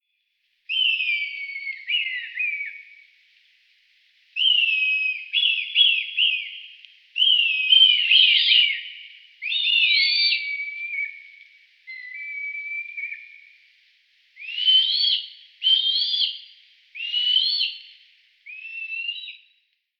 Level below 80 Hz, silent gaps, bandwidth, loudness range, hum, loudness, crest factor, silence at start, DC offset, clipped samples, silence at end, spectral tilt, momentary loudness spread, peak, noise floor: under -90 dBFS; none; 9.8 kHz; 12 LU; none; -19 LUFS; 20 dB; 0.7 s; under 0.1%; under 0.1%; 0.65 s; 9 dB/octave; 20 LU; -4 dBFS; -72 dBFS